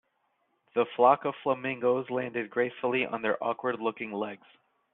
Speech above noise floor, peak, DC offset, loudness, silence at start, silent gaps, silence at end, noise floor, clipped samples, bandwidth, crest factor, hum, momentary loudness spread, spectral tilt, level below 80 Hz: 46 dB; -8 dBFS; under 0.1%; -29 LUFS; 0.75 s; none; 0.55 s; -75 dBFS; under 0.1%; 4 kHz; 22 dB; none; 11 LU; -3.5 dB/octave; -76 dBFS